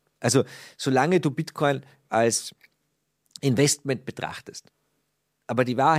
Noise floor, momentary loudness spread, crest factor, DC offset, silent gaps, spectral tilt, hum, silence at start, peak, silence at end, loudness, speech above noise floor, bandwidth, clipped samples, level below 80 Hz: -75 dBFS; 13 LU; 20 dB; under 0.1%; none; -4.5 dB/octave; none; 0.2 s; -6 dBFS; 0 s; -25 LUFS; 51 dB; 16 kHz; under 0.1%; -68 dBFS